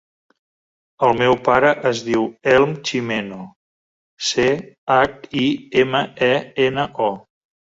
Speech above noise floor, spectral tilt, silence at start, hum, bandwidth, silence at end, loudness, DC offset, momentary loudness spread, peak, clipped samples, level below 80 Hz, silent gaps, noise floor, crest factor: over 72 dB; -4.5 dB/octave; 1 s; none; 8 kHz; 0.55 s; -18 LUFS; under 0.1%; 9 LU; -2 dBFS; under 0.1%; -54 dBFS; 3.56-4.17 s, 4.78-4.87 s; under -90 dBFS; 18 dB